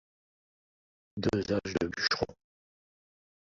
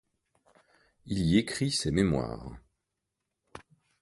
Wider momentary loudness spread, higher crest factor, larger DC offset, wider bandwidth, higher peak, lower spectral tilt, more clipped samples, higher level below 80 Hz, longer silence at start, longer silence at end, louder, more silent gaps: second, 7 LU vs 14 LU; about the same, 24 dB vs 22 dB; neither; second, 7.8 kHz vs 11.5 kHz; about the same, -12 dBFS vs -10 dBFS; about the same, -5 dB/octave vs -5.5 dB/octave; neither; second, -58 dBFS vs -50 dBFS; about the same, 1.15 s vs 1.05 s; first, 1.2 s vs 0.4 s; second, -32 LUFS vs -29 LUFS; neither